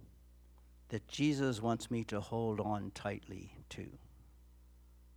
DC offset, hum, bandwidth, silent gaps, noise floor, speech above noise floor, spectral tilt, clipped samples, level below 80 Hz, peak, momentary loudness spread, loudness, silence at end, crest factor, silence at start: under 0.1%; 60 Hz at -60 dBFS; 18 kHz; none; -61 dBFS; 23 dB; -6 dB/octave; under 0.1%; -60 dBFS; -20 dBFS; 16 LU; -38 LUFS; 0 s; 20 dB; 0 s